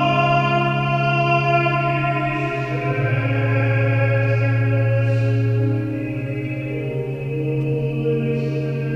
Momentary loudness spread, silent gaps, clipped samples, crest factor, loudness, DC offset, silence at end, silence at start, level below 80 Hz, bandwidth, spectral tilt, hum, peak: 8 LU; none; under 0.1%; 14 dB; -20 LUFS; under 0.1%; 0 s; 0 s; -46 dBFS; 6.6 kHz; -8.5 dB/octave; none; -4 dBFS